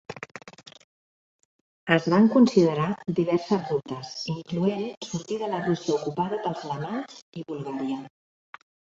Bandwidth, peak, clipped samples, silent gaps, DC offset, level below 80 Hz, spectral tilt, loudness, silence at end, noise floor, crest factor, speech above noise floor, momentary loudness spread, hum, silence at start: 7.8 kHz; -4 dBFS; under 0.1%; 0.84-1.39 s, 1.45-1.86 s, 4.97-5.01 s, 7.22-7.32 s; under 0.1%; -66 dBFS; -6.5 dB/octave; -26 LUFS; 0.9 s; under -90 dBFS; 22 dB; over 65 dB; 20 LU; none; 0.1 s